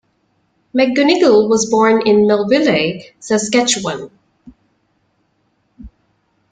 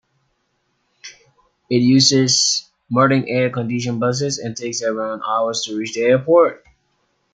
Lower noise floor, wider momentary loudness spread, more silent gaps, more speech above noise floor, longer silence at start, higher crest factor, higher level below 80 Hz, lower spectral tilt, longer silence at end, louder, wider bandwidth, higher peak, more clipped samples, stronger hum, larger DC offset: second, -63 dBFS vs -68 dBFS; about the same, 12 LU vs 10 LU; neither; about the same, 50 dB vs 51 dB; second, 0.75 s vs 1.05 s; about the same, 14 dB vs 18 dB; first, -52 dBFS vs -60 dBFS; about the same, -4 dB/octave vs -4 dB/octave; about the same, 0.65 s vs 0.75 s; first, -13 LUFS vs -17 LUFS; about the same, 9.4 kHz vs 9.6 kHz; about the same, -2 dBFS vs -2 dBFS; neither; neither; neither